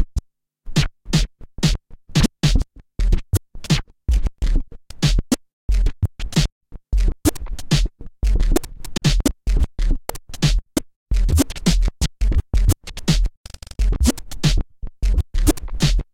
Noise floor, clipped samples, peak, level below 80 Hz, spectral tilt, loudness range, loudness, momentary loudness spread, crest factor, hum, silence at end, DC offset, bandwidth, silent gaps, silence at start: -37 dBFS; under 0.1%; -2 dBFS; -22 dBFS; -5 dB/octave; 2 LU; -22 LUFS; 8 LU; 18 dB; none; 0.1 s; under 0.1%; 17 kHz; 5.53-5.69 s, 6.52-6.61 s, 10.96-11.06 s, 13.37-13.44 s; 0 s